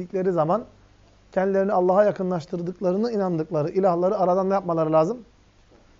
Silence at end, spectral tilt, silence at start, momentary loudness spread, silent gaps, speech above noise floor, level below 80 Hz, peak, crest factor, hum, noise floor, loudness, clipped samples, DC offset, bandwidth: 0.75 s; -7.5 dB/octave; 0 s; 7 LU; none; 33 dB; -60 dBFS; -8 dBFS; 16 dB; 50 Hz at -50 dBFS; -55 dBFS; -23 LUFS; under 0.1%; under 0.1%; 7.6 kHz